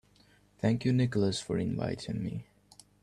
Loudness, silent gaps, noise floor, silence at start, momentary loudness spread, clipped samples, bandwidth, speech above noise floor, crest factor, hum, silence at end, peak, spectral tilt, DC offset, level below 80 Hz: -31 LUFS; none; -64 dBFS; 0.65 s; 9 LU; under 0.1%; 11.5 kHz; 33 dB; 18 dB; 50 Hz at -50 dBFS; 0.6 s; -14 dBFS; -6.5 dB/octave; under 0.1%; -60 dBFS